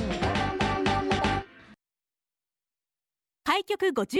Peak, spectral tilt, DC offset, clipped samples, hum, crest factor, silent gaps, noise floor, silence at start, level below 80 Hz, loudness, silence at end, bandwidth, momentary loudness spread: -12 dBFS; -5 dB/octave; under 0.1%; under 0.1%; none; 18 dB; none; under -90 dBFS; 0 s; -44 dBFS; -27 LUFS; 0 s; 16 kHz; 7 LU